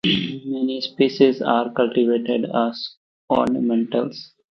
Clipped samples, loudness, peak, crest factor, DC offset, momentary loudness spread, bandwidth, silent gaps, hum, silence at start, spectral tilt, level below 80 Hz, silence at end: under 0.1%; -21 LUFS; -2 dBFS; 18 dB; under 0.1%; 10 LU; 6.2 kHz; 2.97-3.28 s; none; 0.05 s; -7 dB/octave; -60 dBFS; 0.25 s